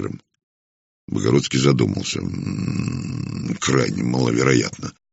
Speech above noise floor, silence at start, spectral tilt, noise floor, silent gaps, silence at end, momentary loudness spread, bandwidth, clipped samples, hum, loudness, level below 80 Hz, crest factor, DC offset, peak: over 70 dB; 0 s; -5.5 dB/octave; under -90 dBFS; 0.43-1.08 s; 0.2 s; 11 LU; 8 kHz; under 0.1%; none; -21 LUFS; -50 dBFS; 20 dB; under 0.1%; -2 dBFS